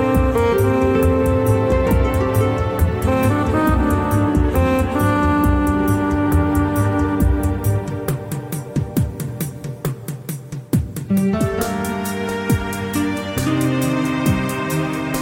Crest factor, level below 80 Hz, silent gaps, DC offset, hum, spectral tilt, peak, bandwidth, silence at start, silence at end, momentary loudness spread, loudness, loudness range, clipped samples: 12 dB; -28 dBFS; none; under 0.1%; none; -7 dB/octave; -6 dBFS; 17 kHz; 0 s; 0 s; 9 LU; -19 LUFS; 6 LU; under 0.1%